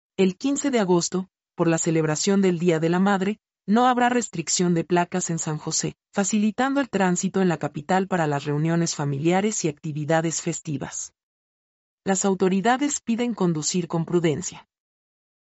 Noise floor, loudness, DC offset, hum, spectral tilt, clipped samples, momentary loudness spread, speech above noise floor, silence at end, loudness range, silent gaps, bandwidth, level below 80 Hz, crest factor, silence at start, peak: under -90 dBFS; -23 LUFS; under 0.1%; none; -5 dB/octave; under 0.1%; 8 LU; over 67 dB; 0.95 s; 4 LU; 11.23-11.98 s; 8.2 kHz; -64 dBFS; 16 dB; 0.2 s; -8 dBFS